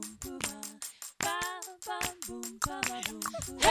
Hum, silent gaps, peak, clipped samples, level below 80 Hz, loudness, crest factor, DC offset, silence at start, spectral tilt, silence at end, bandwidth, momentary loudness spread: none; none; -10 dBFS; under 0.1%; -54 dBFS; -35 LUFS; 26 dB; under 0.1%; 0 s; -1.5 dB/octave; 0 s; 16 kHz; 9 LU